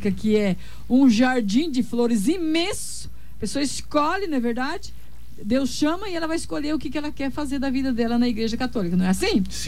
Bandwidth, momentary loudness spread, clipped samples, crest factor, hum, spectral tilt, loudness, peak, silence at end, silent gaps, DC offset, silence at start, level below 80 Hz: 15.5 kHz; 10 LU; under 0.1%; 14 dB; none; -5 dB/octave; -23 LUFS; -8 dBFS; 0 s; none; 3%; 0 s; -44 dBFS